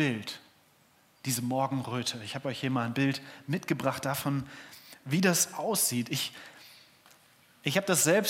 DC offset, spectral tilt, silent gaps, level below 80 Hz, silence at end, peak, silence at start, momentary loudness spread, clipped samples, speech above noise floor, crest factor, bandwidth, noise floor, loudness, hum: under 0.1%; -3.5 dB/octave; none; -74 dBFS; 0 s; -10 dBFS; 0 s; 19 LU; under 0.1%; 34 dB; 20 dB; 16.5 kHz; -64 dBFS; -30 LUFS; none